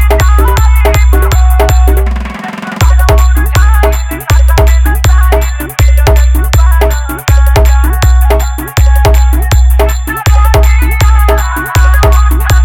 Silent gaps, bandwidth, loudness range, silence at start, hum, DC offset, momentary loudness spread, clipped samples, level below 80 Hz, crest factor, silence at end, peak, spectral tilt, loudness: none; 17 kHz; 1 LU; 0 s; none; under 0.1%; 5 LU; 1%; -6 dBFS; 6 dB; 0 s; 0 dBFS; -5 dB/octave; -8 LUFS